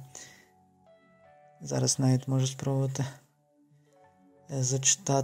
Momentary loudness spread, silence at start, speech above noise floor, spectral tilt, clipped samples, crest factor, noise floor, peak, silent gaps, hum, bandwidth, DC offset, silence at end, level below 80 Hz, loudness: 21 LU; 0 s; 38 dB; -4.5 dB/octave; under 0.1%; 22 dB; -65 dBFS; -10 dBFS; none; none; 15.5 kHz; under 0.1%; 0 s; -70 dBFS; -28 LUFS